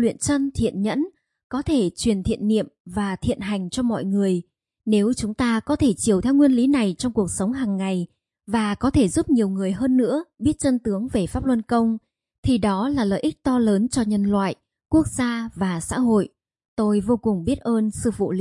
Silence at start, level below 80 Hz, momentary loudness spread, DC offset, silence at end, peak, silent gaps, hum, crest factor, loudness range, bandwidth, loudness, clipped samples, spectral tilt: 0 s; -44 dBFS; 7 LU; under 0.1%; 0 s; -6 dBFS; 1.44-1.50 s, 2.80-2.85 s, 12.38-12.43 s, 16.68-16.77 s; none; 14 dB; 3 LU; 11.5 kHz; -22 LUFS; under 0.1%; -6 dB/octave